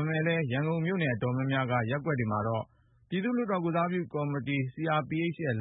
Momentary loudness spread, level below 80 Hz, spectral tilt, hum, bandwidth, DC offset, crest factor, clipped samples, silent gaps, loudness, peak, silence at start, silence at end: 4 LU; -64 dBFS; -11 dB/octave; none; 4 kHz; under 0.1%; 14 dB; under 0.1%; none; -30 LUFS; -16 dBFS; 0 s; 0 s